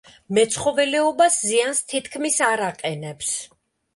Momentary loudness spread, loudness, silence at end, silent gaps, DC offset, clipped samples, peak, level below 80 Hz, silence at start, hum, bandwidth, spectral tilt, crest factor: 10 LU; -21 LUFS; 0.5 s; none; under 0.1%; under 0.1%; -6 dBFS; -62 dBFS; 0.3 s; none; 12 kHz; -2.5 dB/octave; 16 dB